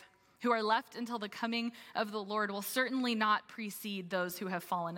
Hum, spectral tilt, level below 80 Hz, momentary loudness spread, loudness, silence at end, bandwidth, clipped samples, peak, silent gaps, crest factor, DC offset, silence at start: none; -4 dB/octave; -86 dBFS; 8 LU; -35 LUFS; 0 s; 17 kHz; under 0.1%; -16 dBFS; none; 20 dB; under 0.1%; 0 s